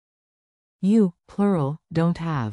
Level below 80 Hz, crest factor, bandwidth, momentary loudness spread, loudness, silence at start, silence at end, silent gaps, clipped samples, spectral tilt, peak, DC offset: -56 dBFS; 14 dB; 10.5 kHz; 7 LU; -23 LUFS; 0.8 s; 0 s; none; under 0.1%; -9 dB/octave; -10 dBFS; under 0.1%